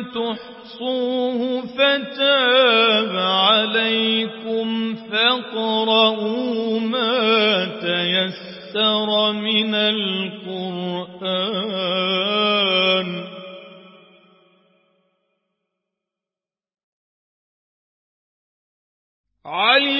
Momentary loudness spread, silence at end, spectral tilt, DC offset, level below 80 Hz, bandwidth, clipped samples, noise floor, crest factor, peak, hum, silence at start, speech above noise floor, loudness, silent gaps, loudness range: 13 LU; 0 s; -8.5 dB/octave; under 0.1%; -72 dBFS; 5.8 kHz; under 0.1%; under -90 dBFS; 20 dB; 0 dBFS; none; 0 s; over 70 dB; -18 LUFS; 16.83-19.24 s; 5 LU